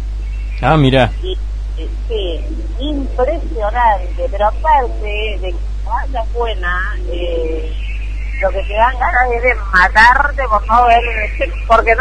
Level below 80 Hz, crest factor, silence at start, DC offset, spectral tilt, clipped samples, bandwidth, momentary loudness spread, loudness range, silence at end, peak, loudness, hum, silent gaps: -20 dBFS; 14 dB; 0 s; under 0.1%; -6.5 dB/octave; under 0.1%; 9.4 kHz; 13 LU; 8 LU; 0 s; 0 dBFS; -15 LUFS; none; none